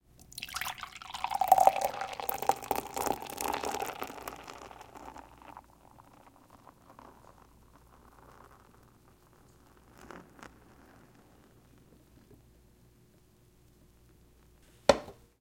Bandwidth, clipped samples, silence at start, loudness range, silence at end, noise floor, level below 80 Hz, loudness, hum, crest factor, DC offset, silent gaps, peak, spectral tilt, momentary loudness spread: 17 kHz; under 0.1%; 0.35 s; 27 LU; 0.3 s; -63 dBFS; -62 dBFS; -32 LUFS; none; 32 dB; under 0.1%; none; -4 dBFS; -3 dB/octave; 28 LU